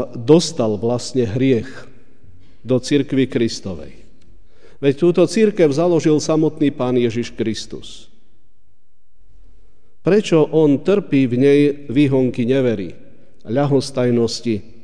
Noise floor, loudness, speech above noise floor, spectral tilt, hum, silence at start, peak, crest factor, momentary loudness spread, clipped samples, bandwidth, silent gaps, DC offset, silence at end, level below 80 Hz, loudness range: -61 dBFS; -17 LUFS; 45 dB; -6.5 dB/octave; none; 0 s; 0 dBFS; 18 dB; 10 LU; under 0.1%; 10 kHz; none; 2%; 0.25 s; -52 dBFS; 7 LU